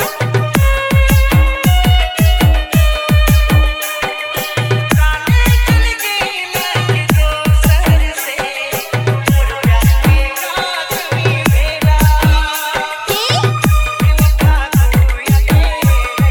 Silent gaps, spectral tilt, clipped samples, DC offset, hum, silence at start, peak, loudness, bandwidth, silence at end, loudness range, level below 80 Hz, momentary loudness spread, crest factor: none; -5 dB/octave; under 0.1%; under 0.1%; none; 0 s; 0 dBFS; -13 LUFS; over 20 kHz; 0 s; 2 LU; -14 dBFS; 6 LU; 12 dB